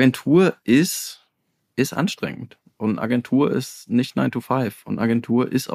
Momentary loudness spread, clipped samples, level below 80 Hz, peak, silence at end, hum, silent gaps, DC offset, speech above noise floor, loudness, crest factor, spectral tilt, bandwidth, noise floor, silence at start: 12 LU; under 0.1%; -64 dBFS; -4 dBFS; 0 s; none; none; under 0.1%; 52 dB; -21 LUFS; 16 dB; -5.5 dB/octave; 15.5 kHz; -72 dBFS; 0 s